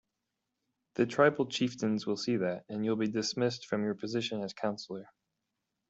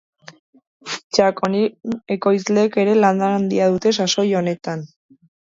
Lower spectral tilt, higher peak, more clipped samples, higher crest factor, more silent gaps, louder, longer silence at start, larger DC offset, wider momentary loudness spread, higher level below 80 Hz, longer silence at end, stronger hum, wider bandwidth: about the same, -5 dB/octave vs -5 dB/octave; second, -12 dBFS vs 0 dBFS; neither; about the same, 22 dB vs 18 dB; second, none vs 1.04-1.10 s; second, -32 LUFS vs -18 LUFS; about the same, 0.95 s vs 0.85 s; neither; second, 9 LU vs 13 LU; second, -74 dBFS vs -62 dBFS; first, 0.85 s vs 0.55 s; neither; about the same, 8.2 kHz vs 7.8 kHz